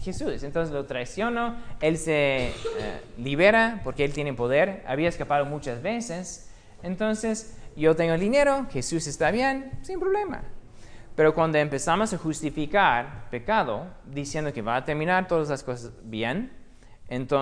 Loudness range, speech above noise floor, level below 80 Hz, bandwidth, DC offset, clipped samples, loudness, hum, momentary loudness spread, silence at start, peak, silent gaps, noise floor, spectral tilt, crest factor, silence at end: 3 LU; 20 dB; -44 dBFS; 10.5 kHz; under 0.1%; under 0.1%; -26 LUFS; none; 14 LU; 0 s; -6 dBFS; none; -45 dBFS; -5 dB/octave; 20 dB; 0 s